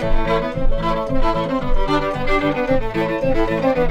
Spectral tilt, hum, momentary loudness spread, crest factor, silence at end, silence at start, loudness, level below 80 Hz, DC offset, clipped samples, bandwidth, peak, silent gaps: -7 dB/octave; none; 3 LU; 12 dB; 0 s; 0 s; -20 LUFS; -22 dBFS; under 0.1%; under 0.1%; 7.2 kHz; -4 dBFS; none